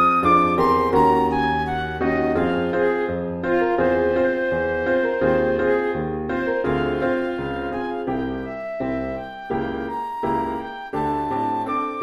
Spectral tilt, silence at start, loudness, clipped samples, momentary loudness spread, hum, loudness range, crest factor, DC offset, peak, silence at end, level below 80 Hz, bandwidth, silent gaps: -7.5 dB/octave; 0 s; -22 LUFS; under 0.1%; 10 LU; none; 6 LU; 16 dB; under 0.1%; -6 dBFS; 0 s; -42 dBFS; 13 kHz; none